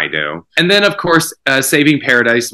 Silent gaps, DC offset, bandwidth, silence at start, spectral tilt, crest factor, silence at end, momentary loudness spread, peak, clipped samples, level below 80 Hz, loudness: none; under 0.1%; 16.5 kHz; 0 s; -3.5 dB/octave; 14 dB; 0.05 s; 6 LU; 0 dBFS; 0.3%; -54 dBFS; -12 LUFS